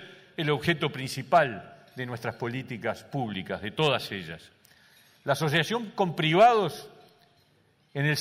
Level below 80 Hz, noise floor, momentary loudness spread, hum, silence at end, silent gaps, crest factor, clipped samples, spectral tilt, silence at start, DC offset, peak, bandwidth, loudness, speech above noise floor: -66 dBFS; -65 dBFS; 17 LU; none; 0 s; none; 18 dB; under 0.1%; -5.5 dB/octave; 0 s; under 0.1%; -10 dBFS; 16 kHz; -27 LUFS; 38 dB